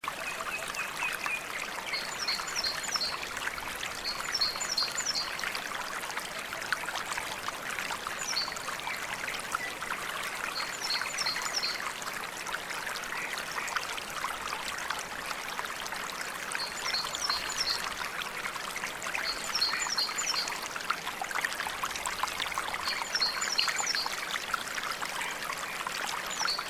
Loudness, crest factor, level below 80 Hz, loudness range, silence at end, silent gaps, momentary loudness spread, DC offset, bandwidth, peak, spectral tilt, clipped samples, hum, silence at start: -32 LUFS; 22 dB; -62 dBFS; 4 LU; 0 s; none; 6 LU; under 0.1%; 16 kHz; -12 dBFS; 0 dB/octave; under 0.1%; none; 0.05 s